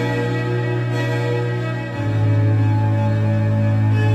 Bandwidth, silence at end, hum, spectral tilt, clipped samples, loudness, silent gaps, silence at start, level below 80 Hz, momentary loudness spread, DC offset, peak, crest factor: 8 kHz; 0 s; none; -8 dB/octave; under 0.1%; -19 LUFS; none; 0 s; -46 dBFS; 5 LU; under 0.1%; -8 dBFS; 10 dB